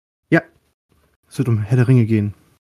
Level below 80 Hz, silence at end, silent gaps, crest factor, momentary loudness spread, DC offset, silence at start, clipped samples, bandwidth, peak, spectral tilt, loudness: -56 dBFS; 0.3 s; 0.74-0.89 s, 1.16-1.23 s; 16 dB; 11 LU; under 0.1%; 0.3 s; under 0.1%; 11.5 kHz; -2 dBFS; -8.5 dB/octave; -18 LUFS